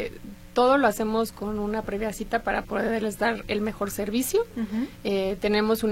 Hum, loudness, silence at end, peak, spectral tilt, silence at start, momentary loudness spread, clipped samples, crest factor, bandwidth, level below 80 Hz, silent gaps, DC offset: none; -26 LUFS; 0 s; -8 dBFS; -4.5 dB/octave; 0 s; 9 LU; under 0.1%; 18 dB; 16.5 kHz; -46 dBFS; none; under 0.1%